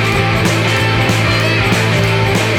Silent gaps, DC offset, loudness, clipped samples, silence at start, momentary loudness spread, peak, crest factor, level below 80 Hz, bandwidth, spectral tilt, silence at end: none; under 0.1%; -12 LUFS; under 0.1%; 0 s; 1 LU; 0 dBFS; 12 dB; -32 dBFS; 16 kHz; -5 dB/octave; 0 s